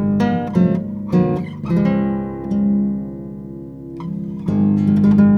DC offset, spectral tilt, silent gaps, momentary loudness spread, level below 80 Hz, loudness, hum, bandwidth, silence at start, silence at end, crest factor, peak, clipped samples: under 0.1%; -10 dB/octave; none; 16 LU; -44 dBFS; -18 LUFS; 50 Hz at -40 dBFS; 5.8 kHz; 0 s; 0 s; 14 dB; -2 dBFS; under 0.1%